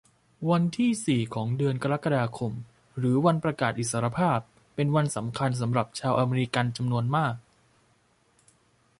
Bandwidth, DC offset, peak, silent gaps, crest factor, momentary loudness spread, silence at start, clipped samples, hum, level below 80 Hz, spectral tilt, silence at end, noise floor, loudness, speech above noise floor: 11.5 kHz; under 0.1%; -8 dBFS; none; 18 dB; 7 LU; 0.4 s; under 0.1%; none; -60 dBFS; -6 dB/octave; 1.6 s; -66 dBFS; -27 LUFS; 40 dB